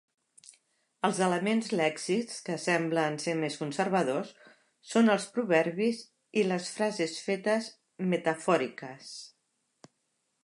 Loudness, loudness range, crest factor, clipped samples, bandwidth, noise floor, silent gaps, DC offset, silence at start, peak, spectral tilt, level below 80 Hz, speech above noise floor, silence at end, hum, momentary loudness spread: -30 LUFS; 3 LU; 20 dB; under 0.1%; 11.5 kHz; -78 dBFS; none; under 0.1%; 1.05 s; -10 dBFS; -5 dB/octave; -82 dBFS; 49 dB; 1.15 s; none; 11 LU